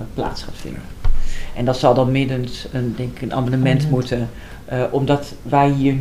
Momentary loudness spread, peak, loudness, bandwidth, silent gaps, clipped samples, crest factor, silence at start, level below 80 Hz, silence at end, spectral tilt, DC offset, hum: 14 LU; 0 dBFS; -20 LUFS; 12.5 kHz; none; under 0.1%; 18 dB; 0 s; -26 dBFS; 0 s; -7.5 dB/octave; 0.6%; none